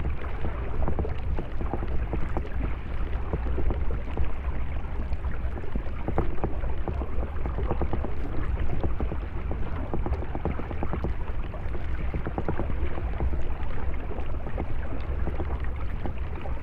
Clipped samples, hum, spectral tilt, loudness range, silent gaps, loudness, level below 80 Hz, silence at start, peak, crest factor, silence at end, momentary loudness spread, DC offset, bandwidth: under 0.1%; none; -9.5 dB/octave; 1 LU; none; -33 LUFS; -30 dBFS; 0 s; -12 dBFS; 14 dB; 0 s; 4 LU; under 0.1%; 3.8 kHz